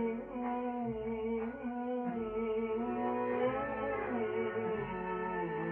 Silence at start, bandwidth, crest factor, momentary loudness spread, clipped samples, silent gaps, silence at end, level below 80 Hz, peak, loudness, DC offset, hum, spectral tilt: 0 s; 3.6 kHz; 14 dB; 4 LU; under 0.1%; none; 0 s; -60 dBFS; -22 dBFS; -37 LUFS; under 0.1%; none; -9.5 dB/octave